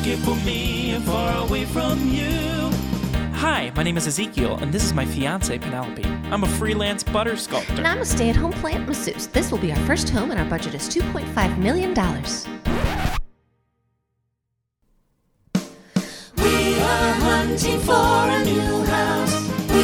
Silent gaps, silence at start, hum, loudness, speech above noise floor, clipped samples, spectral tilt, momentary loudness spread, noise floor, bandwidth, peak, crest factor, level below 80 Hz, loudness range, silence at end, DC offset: none; 0 s; none; -22 LUFS; 55 dB; under 0.1%; -4.5 dB/octave; 8 LU; -77 dBFS; over 20 kHz; -4 dBFS; 18 dB; -32 dBFS; 8 LU; 0 s; under 0.1%